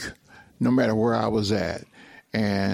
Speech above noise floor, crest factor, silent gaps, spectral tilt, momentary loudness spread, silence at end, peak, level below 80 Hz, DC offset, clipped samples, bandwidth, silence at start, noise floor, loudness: 27 dB; 16 dB; none; -6.5 dB/octave; 11 LU; 0 s; -8 dBFS; -54 dBFS; under 0.1%; under 0.1%; 14.5 kHz; 0 s; -50 dBFS; -24 LUFS